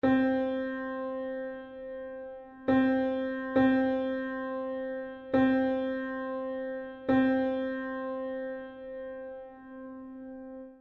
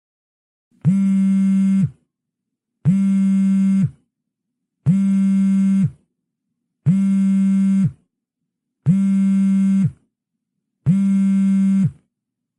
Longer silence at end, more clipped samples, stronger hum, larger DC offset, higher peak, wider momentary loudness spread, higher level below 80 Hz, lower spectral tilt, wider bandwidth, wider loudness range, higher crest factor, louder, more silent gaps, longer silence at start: second, 0.05 s vs 0.65 s; neither; neither; neither; second, -14 dBFS vs -6 dBFS; first, 18 LU vs 7 LU; about the same, -62 dBFS vs -58 dBFS; about the same, -8.5 dB/octave vs -9 dB/octave; second, 4.3 kHz vs 8.8 kHz; about the same, 4 LU vs 2 LU; first, 18 dB vs 12 dB; second, -31 LUFS vs -18 LUFS; neither; second, 0.05 s vs 0.85 s